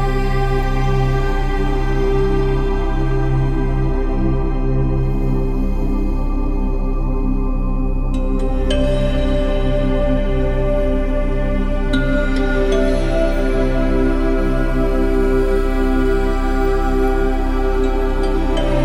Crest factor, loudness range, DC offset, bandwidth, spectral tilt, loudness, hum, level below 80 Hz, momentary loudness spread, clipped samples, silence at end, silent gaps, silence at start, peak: 12 dB; 3 LU; under 0.1%; 8 kHz; -7.5 dB/octave; -19 LUFS; none; -18 dBFS; 4 LU; under 0.1%; 0 s; none; 0 s; -4 dBFS